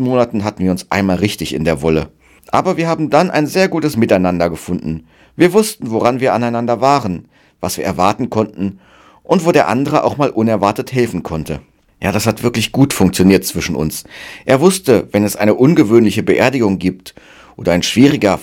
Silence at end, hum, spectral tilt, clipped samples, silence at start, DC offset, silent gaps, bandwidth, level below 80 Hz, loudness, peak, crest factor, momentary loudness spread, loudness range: 0 s; none; -5.5 dB/octave; 0.3%; 0 s; under 0.1%; none; 18.5 kHz; -42 dBFS; -14 LUFS; 0 dBFS; 14 dB; 11 LU; 3 LU